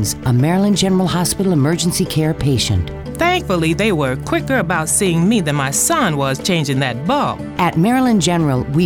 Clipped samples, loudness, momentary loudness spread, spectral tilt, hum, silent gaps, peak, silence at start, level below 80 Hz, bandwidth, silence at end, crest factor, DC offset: under 0.1%; -16 LUFS; 4 LU; -4.5 dB/octave; none; none; -2 dBFS; 0 s; -36 dBFS; 19 kHz; 0 s; 14 dB; under 0.1%